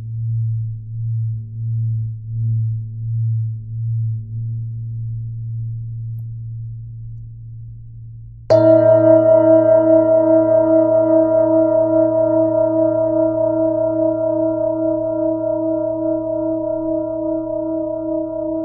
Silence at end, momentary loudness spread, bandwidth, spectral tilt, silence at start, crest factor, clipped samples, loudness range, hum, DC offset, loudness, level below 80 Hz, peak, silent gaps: 0 s; 18 LU; 5.2 kHz; -11.5 dB/octave; 0 s; 16 dB; under 0.1%; 14 LU; none; under 0.1%; -17 LUFS; -46 dBFS; 0 dBFS; none